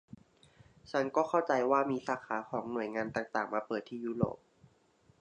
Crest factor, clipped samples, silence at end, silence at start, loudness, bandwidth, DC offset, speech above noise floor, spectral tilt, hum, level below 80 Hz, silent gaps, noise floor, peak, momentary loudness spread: 20 dB; under 0.1%; 0.85 s; 0.85 s; -34 LUFS; 9.8 kHz; under 0.1%; 35 dB; -6.5 dB/octave; none; -68 dBFS; none; -68 dBFS; -14 dBFS; 8 LU